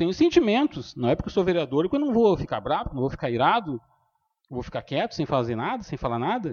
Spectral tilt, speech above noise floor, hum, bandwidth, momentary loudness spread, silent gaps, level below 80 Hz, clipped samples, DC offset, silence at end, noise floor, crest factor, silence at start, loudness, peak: -7 dB/octave; 47 dB; none; 7 kHz; 11 LU; none; -48 dBFS; under 0.1%; under 0.1%; 0 s; -71 dBFS; 18 dB; 0 s; -25 LUFS; -6 dBFS